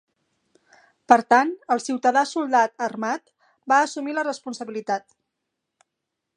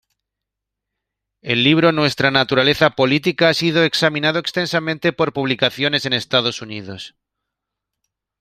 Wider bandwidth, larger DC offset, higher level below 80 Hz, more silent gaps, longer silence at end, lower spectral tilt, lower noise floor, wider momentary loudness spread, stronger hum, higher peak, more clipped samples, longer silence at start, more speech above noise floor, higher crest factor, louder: second, 10.5 kHz vs 15.5 kHz; neither; second, -72 dBFS vs -56 dBFS; neither; about the same, 1.35 s vs 1.3 s; second, -3 dB/octave vs -5 dB/octave; about the same, -82 dBFS vs -82 dBFS; second, 12 LU vs 15 LU; neither; about the same, 0 dBFS vs 0 dBFS; neither; second, 1.1 s vs 1.45 s; second, 60 dB vs 65 dB; first, 24 dB vs 18 dB; second, -22 LUFS vs -16 LUFS